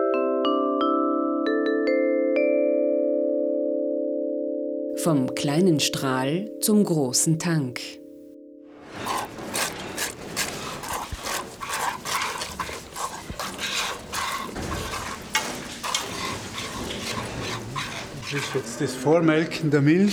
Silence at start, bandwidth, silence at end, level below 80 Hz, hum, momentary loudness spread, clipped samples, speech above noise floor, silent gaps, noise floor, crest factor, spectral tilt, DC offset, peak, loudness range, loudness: 0 s; over 20 kHz; 0 s; -50 dBFS; none; 11 LU; under 0.1%; 23 dB; none; -45 dBFS; 18 dB; -4.5 dB/octave; under 0.1%; -6 dBFS; 7 LU; -25 LUFS